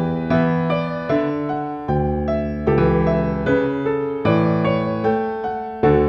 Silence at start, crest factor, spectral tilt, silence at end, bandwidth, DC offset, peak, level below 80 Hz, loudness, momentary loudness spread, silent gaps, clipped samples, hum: 0 s; 16 dB; -9.5 dB/octave; 0 s; 5.8 kHz; under 0.1%; -4 dBFS; -34 dBFS; -20 LUFS; 6 LU; none; under 0.1%; none